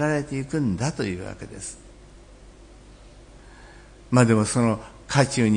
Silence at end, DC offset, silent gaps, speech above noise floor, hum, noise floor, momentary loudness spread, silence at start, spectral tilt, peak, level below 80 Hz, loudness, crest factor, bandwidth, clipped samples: 0 s; under 0.1%; none; 25 dB; 50 Hz at -50 dBFS; -47 dBFS; 17 LU; 0 s; -5.5 dB/octave; -4 dBFS; -48 dBFS; -23 LUFS; 20 dB; 10.5 kHz; under 0.1%